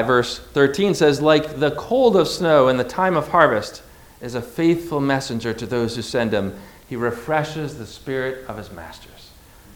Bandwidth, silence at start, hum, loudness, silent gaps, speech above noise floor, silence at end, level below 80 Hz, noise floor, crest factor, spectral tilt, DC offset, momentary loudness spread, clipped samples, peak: 20 kHz; 0 s; none; -20 LUFS; none; 26 dB; 0.5 s; -48 dBFS; -46 dBFS; 20 dB; -5.5 dB/octave; under 0.1%; 18 LU; under 0.1%; 0 dBFS